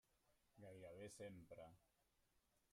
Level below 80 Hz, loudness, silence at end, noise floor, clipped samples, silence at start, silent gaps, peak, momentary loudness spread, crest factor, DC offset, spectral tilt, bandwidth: -84 dBFS; -61 LUFS; 0.15 s; -84 dBFS; under 0.1%; 0.1 s; none; -46 dBFS; 8 LU; 16 dB; under 0.1%; -5 dB/octave; 15 kHz